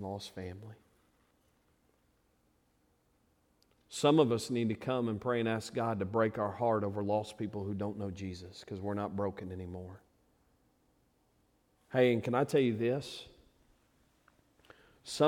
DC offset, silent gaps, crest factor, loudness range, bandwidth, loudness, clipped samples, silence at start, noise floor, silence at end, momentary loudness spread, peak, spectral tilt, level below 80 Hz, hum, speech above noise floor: under 0.1%; none; 22 dB; 10 LU; 16 kHz; -33 LUFS; under 0.1%; 0 s; -73 dBFS; 0 s; 17 LU; -14 dBFS; -6 dB/octave; -70 dBFS; none; 40 dB